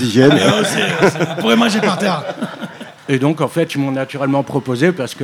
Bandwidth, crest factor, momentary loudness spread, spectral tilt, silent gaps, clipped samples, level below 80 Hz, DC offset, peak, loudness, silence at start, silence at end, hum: 16.5 kHz; 16 dB; 13 LU; -5 dB/octave; none; under 0.1%; -58 dBFS; under 0.1%; 0 dBFS; -15 LUFS; 0 s; 0 s; none